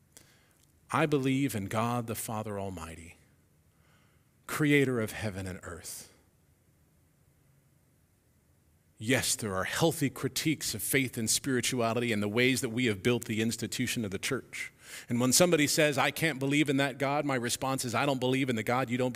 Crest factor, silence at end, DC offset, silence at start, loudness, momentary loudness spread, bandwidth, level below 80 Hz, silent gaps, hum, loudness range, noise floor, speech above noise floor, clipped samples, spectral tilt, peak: 24 dB; 0 s; under 0.1%; 0.9 s; -29 LUFS; 14 LU; 16 kHz; -64 dBFS; none; none; 9 LU; -67 dBFS; 37 dB; under 0.1%; -4 dB/octave; -8 dBFS